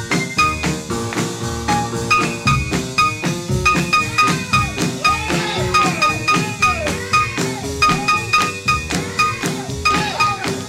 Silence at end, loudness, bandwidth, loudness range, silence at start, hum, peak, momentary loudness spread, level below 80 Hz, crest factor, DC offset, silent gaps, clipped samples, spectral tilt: 0 s; -17 LUFS; 16.5 kHz; 2 LU; 0 s; none; -2 dBFS; 7 LU; -36 dBFS; 18 dB; under 0.1%; none; under 0.1%; -3.5 dB/octave